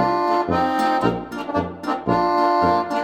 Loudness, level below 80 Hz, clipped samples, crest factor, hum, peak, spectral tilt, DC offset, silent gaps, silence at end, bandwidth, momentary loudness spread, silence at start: -20 LUFS; -48 dBFS; under 0.1%; 16 dB; none; -4 dBFS; -6.5 dB/octave; under 0.1%; none; 0 s; 16.5 kHz; 8 LU; 0 s